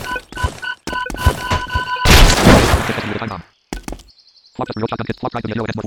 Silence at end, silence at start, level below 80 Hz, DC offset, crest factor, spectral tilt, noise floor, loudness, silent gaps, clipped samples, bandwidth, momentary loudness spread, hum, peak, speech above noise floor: 0 s; 0 s; -22 dBFS; under 0.1%; 16 dB; -4.5 dB/octave; -49 dBFS; -16 LUFS; none; 0.3%; 19 kHz; 20 LU; none; 0 dBFS; 26 dB